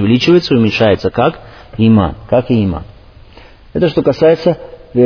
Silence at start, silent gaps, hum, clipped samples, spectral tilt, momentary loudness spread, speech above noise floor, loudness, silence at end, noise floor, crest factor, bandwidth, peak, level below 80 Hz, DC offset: 0 s; none; none; under 0.1%; -7.5 dB/octave; 13 LU; 27 dB; -12 LUFS; 0 s; -38 dBFS; 12 dB; 5.4 kHz; 0 dBFS; -36 dBFS; under 0.1%